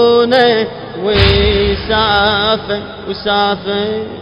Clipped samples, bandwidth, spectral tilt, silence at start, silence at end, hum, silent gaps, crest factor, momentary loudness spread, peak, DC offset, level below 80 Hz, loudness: under 0.1%; 7 kHz; -7 dB/octave; 0 s; 0 s; none; none; 12 dB; 11 LU; 0 dBFS; under 0.1%; -26 dBFS; -13 LUFS